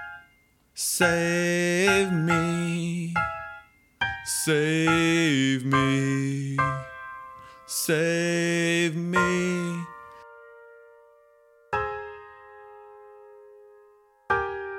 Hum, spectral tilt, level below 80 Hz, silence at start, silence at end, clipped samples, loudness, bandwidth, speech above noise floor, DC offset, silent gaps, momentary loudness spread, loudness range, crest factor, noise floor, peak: none; -4.5 dB/octave; -56 dBFS; 0 s; 0 s; under 0.1%; -24 LUFS; 17.5 kHz; 39 dB; under 0.1%; none; 19 LU; 14 LU; 18 dB; -62 dBFS; -8 dBFS